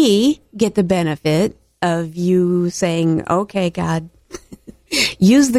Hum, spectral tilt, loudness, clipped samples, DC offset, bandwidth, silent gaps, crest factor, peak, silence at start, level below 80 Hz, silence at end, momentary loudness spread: none; -5.5 dB/octave; -17 LUFS; under 0.1%; under 0.1%; 15 kHz; none; 14 dB; -2 dBFS; 0 s; -48 dBFS; 0 s; 9 LU